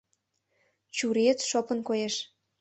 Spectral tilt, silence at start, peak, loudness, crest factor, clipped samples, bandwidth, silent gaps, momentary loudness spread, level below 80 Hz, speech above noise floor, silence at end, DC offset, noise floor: -3 dB/octave; 0.95 s; -10 dBFS; -28 LUFS; 20 dB; under 0.1%; 8.6 kHz; none; 10 LU; -76 dBFS; 49 dB; 0.35 s; under 0.1%; -77 dBFS